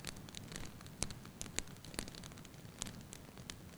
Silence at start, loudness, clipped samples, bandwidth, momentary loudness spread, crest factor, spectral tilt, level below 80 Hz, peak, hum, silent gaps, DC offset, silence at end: 0 s; -47 LUFS; under 0.1%; over 20 kHz; 9 LU; 34 dB; -3 dB/octave; -58 dBFS; -16 dBFS; none; none; under 0.1%; 0 s